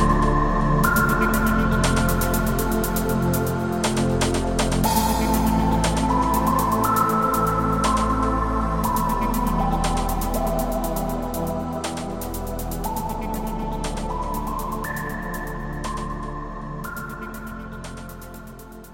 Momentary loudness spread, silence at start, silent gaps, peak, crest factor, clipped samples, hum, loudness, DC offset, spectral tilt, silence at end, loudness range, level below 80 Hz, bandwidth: 13 LU; 0 s; none; -4 dBFS; 18 dB; under 0.1%; none; -23 LUFS; 0.4%; -5.5 dB/octave; 0 s; 9 LU; -30 dBFS; 17 kHz